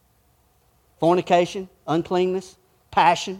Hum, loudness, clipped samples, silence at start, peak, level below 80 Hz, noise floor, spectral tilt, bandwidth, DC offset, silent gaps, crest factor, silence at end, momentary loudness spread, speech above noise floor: none; -22 LUFS; under 0.1%; 1 s; -4 dBFS; -60 dBFS; -62 dBFS; -5.5 dB/octave; 13.5 kHz; under 0.1%; none; 20 dB; 0 s; 9 LU; 41 dB